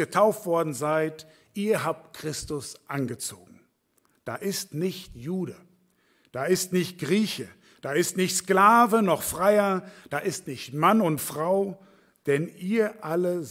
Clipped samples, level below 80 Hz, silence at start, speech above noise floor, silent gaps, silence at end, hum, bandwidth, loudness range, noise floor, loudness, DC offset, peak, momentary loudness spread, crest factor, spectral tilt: under 0.1%; -62 dBFS; 0 s; 43 dB; none; 0 s; none; 16.5 kHz; 11 LU; -69 dBFS; -26 LUFS; under 0.1%; -6 dBFS; 14 LU; 20 dB; -4.5 dB/octave